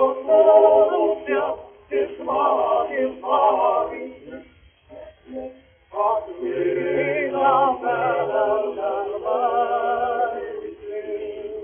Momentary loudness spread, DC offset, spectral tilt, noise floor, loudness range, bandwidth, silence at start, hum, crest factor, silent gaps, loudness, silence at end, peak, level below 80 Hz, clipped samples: 18 LU; under 0.1%; -3.5 dB/octave; -51 dBFS; 7 LU; 3.5 kHz; 0 s; none; 18 dB; none; -21 LUFS; 0 s; -2 dBFS; -60 dBFS; under 0.1%